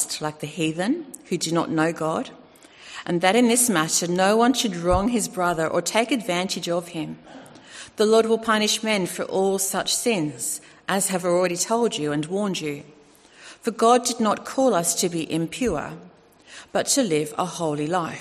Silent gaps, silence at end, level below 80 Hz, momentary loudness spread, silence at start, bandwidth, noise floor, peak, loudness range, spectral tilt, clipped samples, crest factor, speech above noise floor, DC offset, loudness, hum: none; 0 s; -50 dBFS; 12 LU; 0 s; 14 kHz; -51 dBFS; -4 dBFS; 4 LU; -3.5 dB/octave; under 0.1%; 20 dB; 28 dB; under 0.1%; -22 LUFS; none